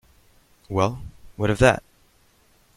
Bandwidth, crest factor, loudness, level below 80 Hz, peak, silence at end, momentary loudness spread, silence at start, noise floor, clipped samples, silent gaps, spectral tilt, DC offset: 15 kHz; 24 dB; -22 LUFS; -42 dBFS; -2 dBFS; 0.95 s; 18 LU; 0.7 s; -59 dBFS; under 0.1%; none; -6 dB/octave; under 0.1%